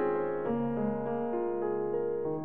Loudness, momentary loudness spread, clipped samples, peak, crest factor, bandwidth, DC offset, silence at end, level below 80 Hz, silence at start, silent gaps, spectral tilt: -32 LUFS; 2 LU; under 0.1%; -20 dBFS; 12 dB; 3.5 kHz; 0.4%; 0 s; -64 dBFS; 0 s; none; -11.5 dB/octave